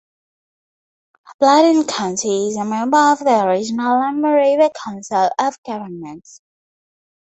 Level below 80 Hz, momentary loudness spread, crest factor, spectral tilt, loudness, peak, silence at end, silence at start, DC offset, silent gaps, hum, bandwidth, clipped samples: -64 dBFS; 15 LU; 16 dB; -4 dB/octave; -16 LUFS; -2 dBFS; 1.05 s; 1.3 s; under 0.1%; 1.34-1.39 s, 5.58-5.63 s; none; 8.2 kHz; under 0.1%